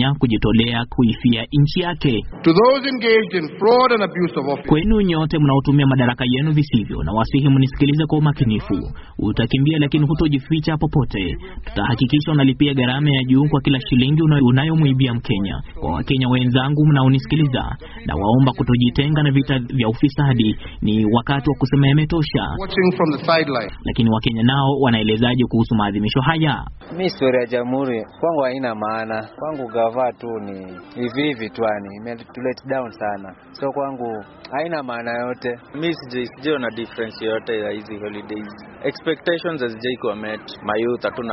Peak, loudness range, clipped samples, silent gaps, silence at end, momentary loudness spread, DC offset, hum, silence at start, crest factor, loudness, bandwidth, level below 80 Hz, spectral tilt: -2 dBFS; 9 LU; under 0.1%; none; 0 s; 12 LU; under 0.1%; none; 0 s; 16 dB; -19 LUFS; 5.8 kHz; -36 dBFS; -5.5 dB/octave